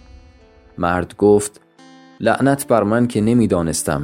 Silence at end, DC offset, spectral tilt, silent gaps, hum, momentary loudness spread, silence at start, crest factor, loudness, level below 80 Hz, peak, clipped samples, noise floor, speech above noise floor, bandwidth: 0 s; under 0.1%; -6 dB/octave; none; none; 6 LU; 0.75 s; 18 dB; -17 LUFS; -44 dBFS; 0 dBFS; under 0.1%; -47 dBFS; 31 dB; 16.5 kHz